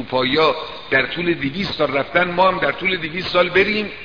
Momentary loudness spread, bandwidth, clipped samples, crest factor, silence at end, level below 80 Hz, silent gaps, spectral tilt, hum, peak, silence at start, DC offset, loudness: 6 LU; 5.4 kHz; under 0.1%; 16 dB; 0 s; -46 dBFS; none; -6 dB/octave; none; -2 dBFS; 0 s; 0.7%; -18 LUFS